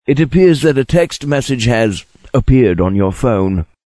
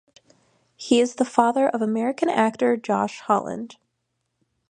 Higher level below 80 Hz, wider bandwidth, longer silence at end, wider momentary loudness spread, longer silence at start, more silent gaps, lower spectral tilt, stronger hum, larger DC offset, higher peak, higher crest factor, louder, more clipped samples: first, -28 dBFS vs -70 dBFS; first, 11 kHz vs 9.8 kHz; second, 0.2 s vs 0.95 s; second, 7 LU vs 12 LU; second, 0.1 s vs 0.8 s; neither; first, -6.5 dB/octave vs -5 dB/octave; neither; first, 0.4% vs under 0.1%; about the same, 0 dBFS vs -2 dBFS; second, 12 dB vs 22 dB; first, -13 LUFS vs -22 LUFS; neither